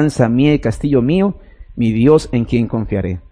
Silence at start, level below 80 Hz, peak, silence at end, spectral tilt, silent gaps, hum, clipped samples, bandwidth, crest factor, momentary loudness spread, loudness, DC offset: 0 s; -34 dBFS; 0 dBFS; 0.1 s; -8 dB/octave; none; none; under 0.1%; 10.5 kHz; 14 dB; 8 LU; -15 LUFS; under 0.1%